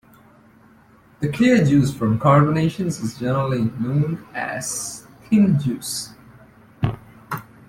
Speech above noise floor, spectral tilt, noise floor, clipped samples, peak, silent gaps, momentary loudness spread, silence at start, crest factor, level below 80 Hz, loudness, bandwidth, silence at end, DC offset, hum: 33 dB; -6 dB/octave; -51 dBFS; under 0.1%; -2 dBFS; none; 15 LU; 1.2 s; 18 dB; -50 dBFS; -20 LUFS; 15.5 kHz; 0.25 s; under 0.1%; none